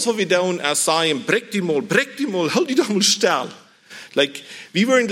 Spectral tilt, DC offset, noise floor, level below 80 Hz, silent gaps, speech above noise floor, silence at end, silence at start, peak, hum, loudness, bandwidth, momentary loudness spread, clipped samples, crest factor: -3 dB/octave; under 0.1%; -42 dBFS; -74 dBFS; none; 23 dB; 0 s; 0 s; -2 dBFS; none; -19 LUFS; 16.5 kHz; 8 LU; under 0.1%; 18 dB